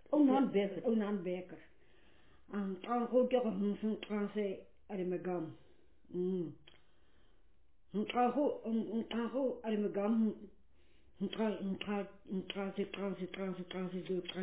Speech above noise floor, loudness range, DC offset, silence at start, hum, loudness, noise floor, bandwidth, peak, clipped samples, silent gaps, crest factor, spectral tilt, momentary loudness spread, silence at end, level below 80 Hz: 35 dB; 5 LU; under 0.1%; 0.1 s; none; -37 LUFS; -72 dBFS; 4 kHz; -18 dBFS; under 0.1%; none; 18 dB; -6 dB/octave; 11 LU; 0 s; -72 dBFS